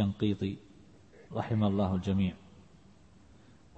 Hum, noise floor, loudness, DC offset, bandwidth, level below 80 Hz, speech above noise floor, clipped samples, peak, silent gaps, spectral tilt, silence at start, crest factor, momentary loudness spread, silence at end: none; -59 dBFS; -32 LUFS; under 0.1%; 8 kHz; -60 dBFS; 28 dB; under 0.1%; -16 dBFS; none; -8.5 dB/octave; 0 s; 16 dB; 13 LU; 1.4 s